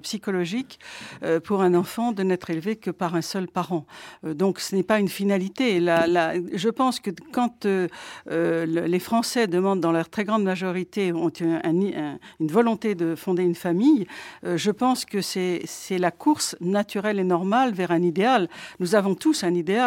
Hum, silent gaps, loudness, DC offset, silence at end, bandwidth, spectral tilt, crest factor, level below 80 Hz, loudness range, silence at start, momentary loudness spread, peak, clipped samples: none; none; -24 LUFS; under 0.1%; 0 s; 17 kHz; -5.5 dB/octave; 18 dB; -68 dBFS; 3 LU; 0.05 s; 9 LU; -6 dBFS; under 0.1%